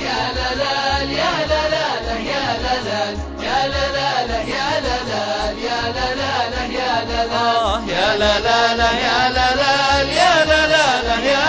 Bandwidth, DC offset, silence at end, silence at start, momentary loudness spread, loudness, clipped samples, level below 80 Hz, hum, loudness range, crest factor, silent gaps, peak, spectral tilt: 8 kHz; under 0.1%; 0 s; 0 s; 7 LU; -17 LUFS; under 0.1%; -32 dBFS; none; 5 LU; 16 dB; none; 0 dBFS; -3.5 dB/octave